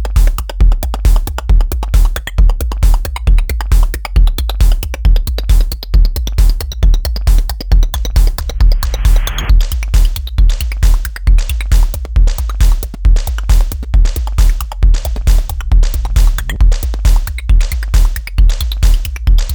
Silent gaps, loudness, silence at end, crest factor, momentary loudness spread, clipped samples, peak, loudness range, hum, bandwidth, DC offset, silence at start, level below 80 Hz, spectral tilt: none; -15 LUFS; 0 s; 10 dB; 2 LU; under 0.1%; 0 dBFS; 0 LU; none; over 20 kHz; under 0.1%; 0 s; -10 dBFS; -5 dB/octave